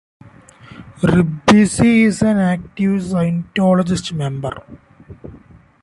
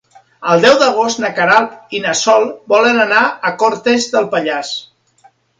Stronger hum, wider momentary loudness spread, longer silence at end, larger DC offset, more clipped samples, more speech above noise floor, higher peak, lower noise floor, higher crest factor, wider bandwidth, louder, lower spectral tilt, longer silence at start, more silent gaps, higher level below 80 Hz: neither; about the same, 11 LU vs 10 LU; second, 0.45 s vs 0.75 s; neither; neither; second, 29 dB vs 38 dB; about the same, 0 dBFS vs 0 dBFS; second, -44 dBFS vs -51 dBFS; about the same, 16 dB vs 14 dB; first, 11.5 kHz vs 9.6 kHz; second, -16 LUFS vs -13 LUFS; first, -6 dB/octave vs -3 dB/octave; first, 0.7 s vs 0.4 s; neither; first, -42 dBFS vs -62 dBFS